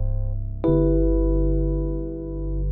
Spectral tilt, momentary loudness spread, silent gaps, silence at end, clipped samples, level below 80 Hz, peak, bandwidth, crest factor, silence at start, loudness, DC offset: -14 dB/octave; 10 LU; none; 0 s; under 0.1%; -24 dBFS; -8 dBFS; 3.8 kHz; 14 dB; 0 s; -24 LUFS; under 0.1%